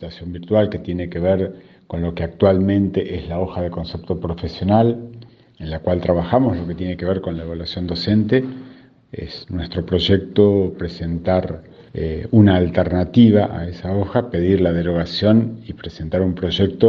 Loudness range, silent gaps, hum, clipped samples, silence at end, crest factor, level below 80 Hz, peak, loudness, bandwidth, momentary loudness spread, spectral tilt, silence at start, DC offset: 5 LU; none; none; under 0.1%; 0 s; 18 dB; -40 dBFS; 0 dBFS; -19 LUFS; 6.8 kHz; 15 LU; -9 dB/octave; 0 s; under 0.1%